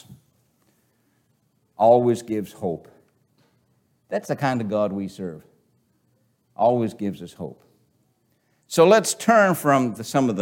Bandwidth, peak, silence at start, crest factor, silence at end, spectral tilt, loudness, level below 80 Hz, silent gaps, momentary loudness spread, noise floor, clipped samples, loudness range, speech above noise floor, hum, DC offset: 17 kHz; -4 dBFS; 0.1 s; 20 dB; 0 s; -5 dB/octave; -21 LUFS; -68 dBFS; none; 19 LU; -67 dBFS; under 0.1%; 8 LU; 46 dB; none; under 0.1%